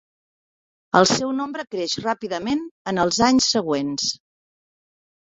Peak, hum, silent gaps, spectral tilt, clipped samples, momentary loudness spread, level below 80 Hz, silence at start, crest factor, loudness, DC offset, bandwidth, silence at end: -2 dBFS; none; 2.71-2.85 s; -3.5 dB/octave; under 0.1%; 10 LU; -56 dBFS; 0.95 s; 22 dB; -21 LUFS; under 0.1%; 8.2 kHz; 1.15 s